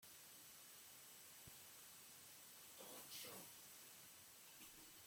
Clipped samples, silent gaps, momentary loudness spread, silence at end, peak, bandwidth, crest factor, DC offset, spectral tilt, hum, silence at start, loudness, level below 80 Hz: under 0.1%; none; 6 LU; 0 s; -42 dBFS; 17 kHz; 18 dB; under 0.1%; -1 dB/octave; none; 0 s; -58 LUFS; -88 dBFS